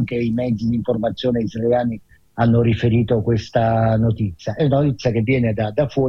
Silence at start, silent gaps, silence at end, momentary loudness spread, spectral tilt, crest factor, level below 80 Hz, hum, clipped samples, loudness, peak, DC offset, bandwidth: 0 s; none; 0 s; 5 LU; -8.5 dB/octave; 12 dB; -42 dBFS; none; under 0.1%; -19 LUFS; -6 dBFS; under 0.1%; 6.6 kHz